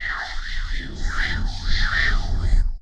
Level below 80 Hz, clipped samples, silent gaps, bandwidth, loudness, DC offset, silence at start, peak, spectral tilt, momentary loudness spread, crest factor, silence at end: -22 dBFS; under 0.1%; none; 8 kHz; -25 LUFS; under 0.1%; 0 s; -6 dBFS; -4 dB/octave; 10 LU; 14 dB; 0.05 s